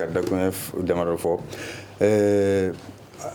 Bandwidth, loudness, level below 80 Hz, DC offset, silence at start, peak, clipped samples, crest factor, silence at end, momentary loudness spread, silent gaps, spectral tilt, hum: over 20 kHz; -23 LUFS; -54 dBFS; under 0.1%; 0 s; -6 dBFS; under 0.1%; 18 dB; 0 s; 16 LU; none; -6 dB/octave; none